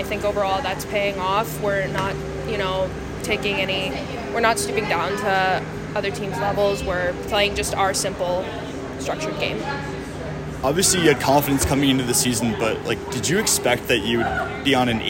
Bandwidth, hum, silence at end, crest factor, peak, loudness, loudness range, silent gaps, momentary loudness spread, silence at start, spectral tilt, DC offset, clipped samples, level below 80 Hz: 16.5 kHz; none; 0 s; 18 dB; -4 dBFS; -22 LUFS; 4 LU; none; 9 LU; 0 s; -3.5 dB/octave; under 0.1%; under 0.1%; -40 dBFS